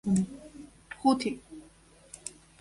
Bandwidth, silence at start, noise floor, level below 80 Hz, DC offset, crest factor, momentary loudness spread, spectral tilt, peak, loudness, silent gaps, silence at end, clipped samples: 11.5 kHz; 0.05 s; -58 dBFS; -60 dBFS; under 0.1%; 20 dB; 23 LU; -5.5 dB/octave; -12 dBFS; -31 LUFS; none; 0.3 s; under 0.1%